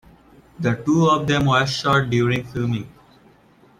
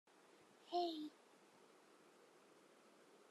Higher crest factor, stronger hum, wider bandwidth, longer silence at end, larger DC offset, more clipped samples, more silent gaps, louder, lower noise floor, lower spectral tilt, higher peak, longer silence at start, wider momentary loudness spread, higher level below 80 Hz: second, 16 dB vs 22 dB; neither; about the same, 14 kHz vs 13 kHz; first, 0.9 s vs 0.15 s; neither; neither; neither; first, -20 LUFS vs -46 LUFS; second, -53 dBFS vs -69 dBFS; first, -6 dB/octave vs -3.5 dB/octave; first, -6 dBFS vs -30 dBFS; about the same, 0.6 s vs 0.65 s; second, 9 LU vs 25 LU; first, -48 dBFS vs under -90 dBFS